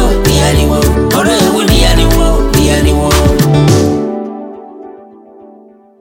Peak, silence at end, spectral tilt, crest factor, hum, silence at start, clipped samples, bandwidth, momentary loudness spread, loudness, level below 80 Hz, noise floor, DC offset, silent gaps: 0 dBFS; 0.55 s; -5 dB/octave; 10 dB; none; 0 s; under 0.1%; 17.5 kHz; 15 LU; -10 LUFS; -16 dBFS; -39 dBFS; under 0.1%; none